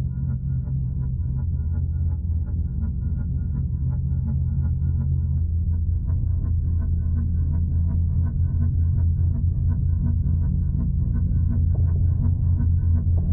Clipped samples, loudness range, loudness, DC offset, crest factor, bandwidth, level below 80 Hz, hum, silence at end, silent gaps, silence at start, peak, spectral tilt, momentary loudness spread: under 0.1%; 3 LU; -24 LUFS; under 0.1%; 10 dB; 1.6 kHz; -26 dBFS; none; 0 s; none; 0 s; -12 dBFS; -15.5 dB/octave; 5 LU